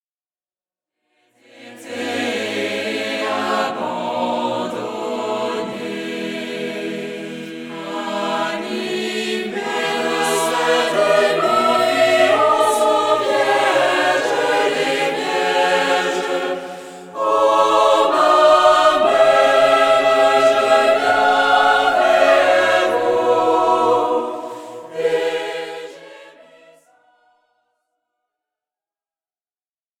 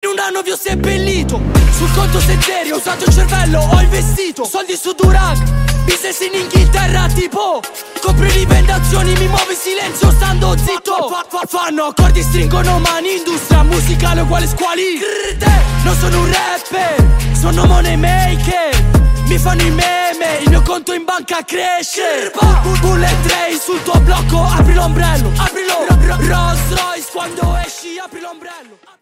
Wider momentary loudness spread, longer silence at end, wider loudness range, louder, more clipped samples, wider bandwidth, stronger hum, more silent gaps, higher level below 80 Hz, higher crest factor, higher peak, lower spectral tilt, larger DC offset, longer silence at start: first, 13 LU vs 7 LU; first, 3.7 s vs 0.4 s; first, 12 LU vs 2 LU; second, -16 LUFS vs -13 LUFS; neither; about the same, 16.5 kHz vs 16.5 kHz; neither; neither; second, -64 dBFS vs -14 dBFS; about the same, 16 dB vs 12 dB; about the same, -2 dBFS vs 0 dBFS; second, -3 dB/octave vs -4.5 dB/octave; neither; first, 1.6 s vs 0.05 s